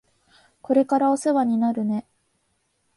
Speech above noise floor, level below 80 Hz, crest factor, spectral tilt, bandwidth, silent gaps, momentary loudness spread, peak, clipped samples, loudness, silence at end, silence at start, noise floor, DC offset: 50 dB; -70 dBFS; 16 dB; -6.5 dB/octave; 11.5 kHz; none; 7 LU; -8 dBFS; under 0.1%; -22 LUFS; 0.95 s; 0.7 s; -70 dBFS; under 0.1%